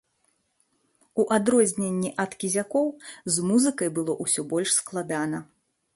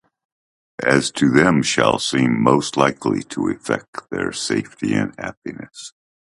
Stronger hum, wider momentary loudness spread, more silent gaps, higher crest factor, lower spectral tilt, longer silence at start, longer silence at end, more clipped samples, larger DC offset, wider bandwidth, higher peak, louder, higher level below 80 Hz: neither; second, 9 LU vs 18 LU; second, none vs 3.88-3.93 s, 5.37-5.42 s; about the same, 20 dB vs 20 dB; about the same, -4 dB/octave vs -4.5 dB/octave; first, 1.15 s vs 0.8 s; about the same, 0.55 s vs 0.5 s; neither; neither; about the same, 12 kHz vs 11.5 kHz; second, -6 dBFS vs 0 dBFS; second, -25 LUFS vs -19 LUFS; second, -68 dBFS vs -52 dBFS